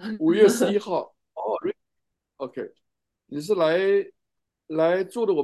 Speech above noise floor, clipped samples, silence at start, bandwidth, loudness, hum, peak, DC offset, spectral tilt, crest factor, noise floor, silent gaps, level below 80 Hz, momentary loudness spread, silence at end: 60 dB; under 0.1%; 0 s; 12.5 kHz; -23 LUFS; none; -4 dBFS; under 0.1%; -5 dB/octave; 20 dB; -82 dBFS; none; -76 dBFS; 19 LU; 0 s